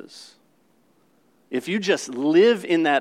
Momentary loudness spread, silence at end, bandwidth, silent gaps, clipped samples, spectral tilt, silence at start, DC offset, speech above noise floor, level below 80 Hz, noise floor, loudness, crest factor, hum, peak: 13 LU; 0 s; 13.5 kHz; none; under 0.1%; -4.5 dB/octave; 0.15 s; under 0.1%; 42 dB; -84 dBFS; -62 dBFS; -21 LUFS; 16 dB; none; -6 dBFS